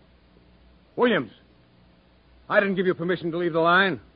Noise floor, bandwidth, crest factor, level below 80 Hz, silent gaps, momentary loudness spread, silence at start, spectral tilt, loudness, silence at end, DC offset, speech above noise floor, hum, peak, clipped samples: -57 dBFS; 5.2 kHz; 20 dB; -60 dBFS; none; 8 LU; 0.95 s; -10 dB/octave; -23 LUFS; 0.15 s; under 0.1%; 34 dB; none; -6 dBFS; under 0.1%